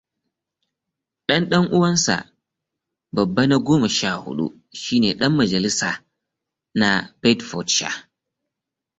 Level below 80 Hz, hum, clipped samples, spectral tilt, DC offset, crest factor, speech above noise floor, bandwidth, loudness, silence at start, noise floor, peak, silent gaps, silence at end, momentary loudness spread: -56 dBFS; none; under 0.1%; -4 dB/octave; under 0.1%; 20 dB; 65 dB; 8.4 kHz; -20 LUFS; 1.3 s; -85 dBFS; -2 dBFS; none; 1 s; 11 LU